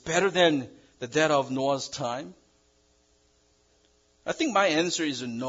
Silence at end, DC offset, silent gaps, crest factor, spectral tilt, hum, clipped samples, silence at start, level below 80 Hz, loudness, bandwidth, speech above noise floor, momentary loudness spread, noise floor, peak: 0 s; under 0.1%; none; 20 dB; -3.5 dB/octave; none; under 0.1%; 0.05 s; -66 dBFS; -26 LUFS; 7.8 kHz; 39 dB; 16 LU; -65 dBFS; -8 dBFS